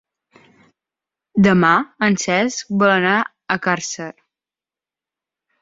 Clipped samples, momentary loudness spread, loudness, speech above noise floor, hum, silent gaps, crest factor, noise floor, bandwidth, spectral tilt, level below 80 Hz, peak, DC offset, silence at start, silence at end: under 0.1%; 11 LU; -17 LUFS; 73 dB; none; none; 18 dB; -90 dBFS; 7.8 kHz; -5 dB/octave; -56 dBFS; -2 dBFS; under 0.1%; 1.35 s; 1.5 s